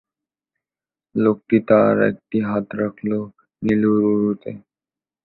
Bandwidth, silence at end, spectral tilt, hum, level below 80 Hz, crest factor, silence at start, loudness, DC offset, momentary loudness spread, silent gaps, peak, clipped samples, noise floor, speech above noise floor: 4.2 kHz; 0.65 s; -10.5 dB/octave; none; -58 dBFS; 18 dB; 1.15 s; -19 LUFS; under 0.1%; 13 LU; none; -2 dBFS; under 0.1%; under -90 dBFS; over 72 dB